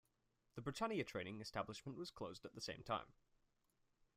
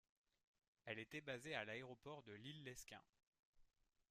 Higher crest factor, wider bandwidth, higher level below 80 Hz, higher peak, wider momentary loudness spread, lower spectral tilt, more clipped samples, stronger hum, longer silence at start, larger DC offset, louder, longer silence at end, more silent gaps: second, 20 dB vs 26 dB; first, 15.5 kHz vs 14 kHz; first, -74 dBFS vs -82 dBFS; about the same, -30 dBFS vs -32 dBFS; about the same, 9 LU vs 11 LU; about the same, -5 dB/octave vs -4 dB/octave; neither; neither; second, 0.55 s vs 0.85 s; neither; first, -48 LUFS vs -54 LUFS; first, 1.05 s vs 0.45 s; second, none vs 3.09-3.13 s, 3.27-3.32 s, 3.39-3.53 s